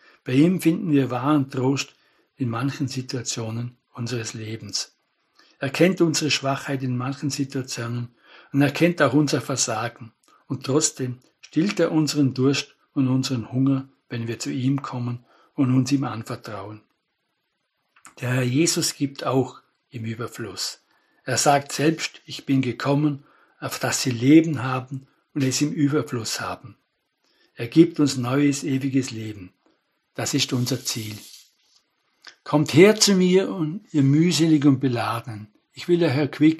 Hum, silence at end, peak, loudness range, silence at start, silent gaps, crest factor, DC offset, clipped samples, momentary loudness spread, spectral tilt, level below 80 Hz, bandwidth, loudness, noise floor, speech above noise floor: none; 0 s; 0 dBFS; 7 LU; 0.25 s; none; 22 dB; under 0.1%; under 0.1%; 16 LU; -5 dB/octave; -68 dBFS; 13 kHz; -22 LUFS; -75 dBFS; 53 dB